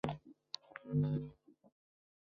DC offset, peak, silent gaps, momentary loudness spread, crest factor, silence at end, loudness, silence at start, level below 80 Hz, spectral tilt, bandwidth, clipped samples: under 0.1%; -18 dBFS; none; 14 LU; 24 dB; 0.9 s; -41 LUFS; 0.05 s; -66 dBFS; -7 dB/octave; 6.6 kHz; under 0.1%